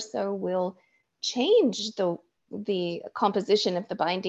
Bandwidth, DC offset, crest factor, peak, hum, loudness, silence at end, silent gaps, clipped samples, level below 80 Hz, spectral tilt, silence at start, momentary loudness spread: 8.2 kHz; under 0.1%; 18 dB; -10 dBFS; none; -27 LUFS; 0 s; none; under 0.1%; -74 dBFS; -4.5 dB/octave; 0 s; 11 LU